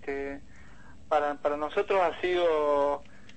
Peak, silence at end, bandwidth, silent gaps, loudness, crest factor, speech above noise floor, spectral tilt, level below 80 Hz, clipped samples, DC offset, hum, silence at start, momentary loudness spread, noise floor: -14 dBFS; 0.35 s; 8.6 kHz; none; -28 LUFS; 14 dB; 26 dB; -5 dB/octave; -56 dBFS; under 0.1%; 0.5%; none; 0 s; 11 LU; -52 dBFS